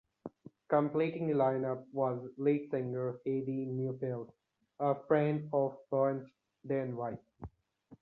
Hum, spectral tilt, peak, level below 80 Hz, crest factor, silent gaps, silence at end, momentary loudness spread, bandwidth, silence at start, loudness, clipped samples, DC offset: none; -11 dB/octave; -16 dBFS; -68 dBFS; 18 dB; none; 0.05 s; 20 LU; 4.5 kHz; 0.25 s; -34 LUFS; under 0.1%; under 0.1%